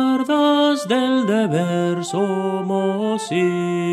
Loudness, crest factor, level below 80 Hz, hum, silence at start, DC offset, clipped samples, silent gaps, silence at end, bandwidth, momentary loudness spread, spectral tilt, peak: -19 LUFS; 14 dB; -74 dBFS; none; 0 s; under 0.1%; under 0.1%; none; 0 s; 13.5 kHz; 5 LU; -6 dB/octave; -4 dBFS